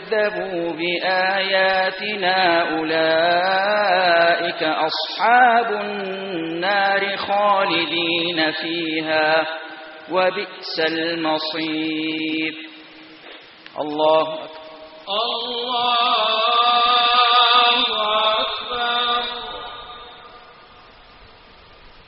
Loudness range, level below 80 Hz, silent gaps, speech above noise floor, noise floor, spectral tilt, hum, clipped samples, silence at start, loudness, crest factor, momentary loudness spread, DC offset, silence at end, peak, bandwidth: 8 LU; -60 dBFS; none; 27 dB; -46 dBFS; 0 dB/octave; none; under 0.1%; 0 s; -18 LUFS; 18 dB; 15 LU; under 0.1%; 0.2 s; -2 dBFS; 5.8 kHz